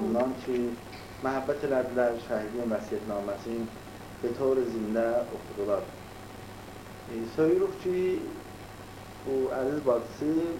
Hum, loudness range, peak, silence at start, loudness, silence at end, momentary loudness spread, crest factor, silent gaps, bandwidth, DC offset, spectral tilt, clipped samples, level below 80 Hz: none; 2 LU; -14 dBFS; 0 s; -30 LUFS; 0 s; 17 LU; 16 dB; none; 16.5 kHz; under 0.1%; -6.5 dB/octave; under 0.1%; -56 dBFS